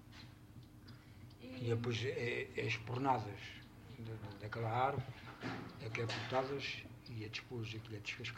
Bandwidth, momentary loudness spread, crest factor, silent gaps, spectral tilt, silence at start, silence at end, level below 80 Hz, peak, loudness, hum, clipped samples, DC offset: 16 kHz; 20 LU; 20 dB; none; -5.5 dB/octave; 0 s; 0 s; -68 dBFS; -22 dBFS; -42 LUFS; none; under 0.1%; under 0.1%